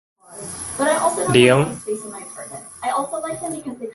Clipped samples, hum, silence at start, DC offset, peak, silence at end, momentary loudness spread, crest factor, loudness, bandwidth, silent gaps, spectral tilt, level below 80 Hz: under 0.1%; none; 0.3 s; under 0.1%; 0 dBFS; 0 s; 19 LU; 22 dB; -20 LUFS; 12 kHz; none; -4.5 dB/octave; -54 dBFS